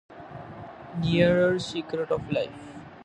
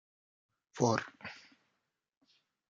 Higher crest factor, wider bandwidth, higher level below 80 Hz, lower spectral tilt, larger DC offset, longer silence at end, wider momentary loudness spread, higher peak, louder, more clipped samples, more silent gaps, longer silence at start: about the same, 20 dB vs 24 dB; first, 10.5 kHz vs 7.6 kHz; first, -52 dBFS vs -78 dBFS; first, -6.5 dB/octave vs -5 dB/octave; neither; second, 0 s vs 1.35 s; about the same, 21 LU vs 22 LU; first, -8 dBFS vs -16 dBFS; first, -26 LUFS vs -33 LUFS; neither; neither; second, 0.1 s vs 0.75 s